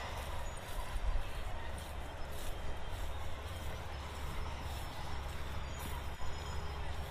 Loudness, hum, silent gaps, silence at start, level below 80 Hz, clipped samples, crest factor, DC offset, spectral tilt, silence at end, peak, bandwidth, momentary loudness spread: -44 LUFS; none; none; 0 s; -42 dBFS; under 0.1%; 16 dB; under 0.1%; -4.5 dB/octave; 0 s; -22 dBFS; 15.5 kHz; 3 LU